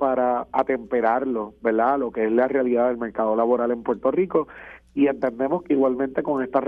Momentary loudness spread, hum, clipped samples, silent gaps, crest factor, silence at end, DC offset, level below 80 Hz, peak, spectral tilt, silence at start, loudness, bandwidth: 5 LU; none; under 0.1%; none; 16 dB; 0 s; under 0.1%; -56 dBFS; -6 dBFS; -9 dB/octave; 0 s; -22 LUFS; 4.8 kHz